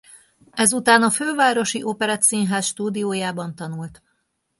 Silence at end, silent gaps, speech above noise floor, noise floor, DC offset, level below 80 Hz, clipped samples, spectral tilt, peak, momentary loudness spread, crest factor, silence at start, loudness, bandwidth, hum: 0.65 s; none; 50 dB; -71 dBFS; under 0.1%; -64 dBFS; under 0.1%; -3 dB/octave; -2 dBFS; 16 LU; 20 dB; 0.15 s; -19 LUFS; 12 kHz; none